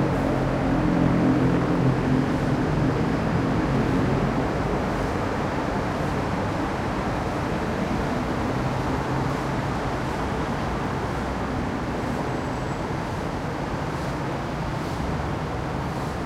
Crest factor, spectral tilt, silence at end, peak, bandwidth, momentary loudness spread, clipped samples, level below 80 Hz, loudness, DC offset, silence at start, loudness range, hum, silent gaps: 14 dB; -7 dB/octave; 0 s; -10 dBFS; 14.5 kHz; 7 LU; under 0.1%; -36 dBFS; -25 LUFS; under 0.1%; 0 s; 6 LU; none; none